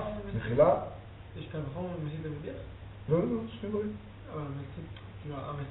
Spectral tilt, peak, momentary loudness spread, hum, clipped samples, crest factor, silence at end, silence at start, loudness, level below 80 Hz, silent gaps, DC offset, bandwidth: -7.5 dB/octave; -12 dBFS; 19 LU; none; under 0.1%; 22 dB; 0 s; 0 s; -33 LUFS; -52 dBFS; none; under 0.1%; 4 kHz